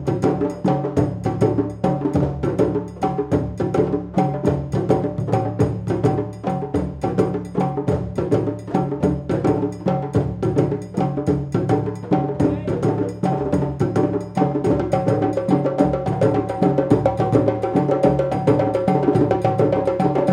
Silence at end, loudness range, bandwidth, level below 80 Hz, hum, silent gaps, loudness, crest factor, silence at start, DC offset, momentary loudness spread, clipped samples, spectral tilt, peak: 0 s; 3 LU; 10.5 kHz; -42 dBFS; none; none; -20 LUFS; 18 dB; 0 s; under 0.1%; 5 LU; under 0.1%; -9 dB/octave; -2 dBFS